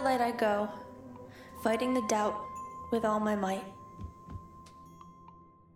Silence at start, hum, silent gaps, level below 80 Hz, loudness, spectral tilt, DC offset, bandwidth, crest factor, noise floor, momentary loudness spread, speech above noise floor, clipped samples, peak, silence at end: 0 s; none; none; -62 dBFS; -32 LUFS; -5 dB/octave; under 0.1%; 16.5 kHz; 18 dB; -56 dBFS; 23 LU; 26 dB; under 0.1%; -16 dBFS; 0.3 s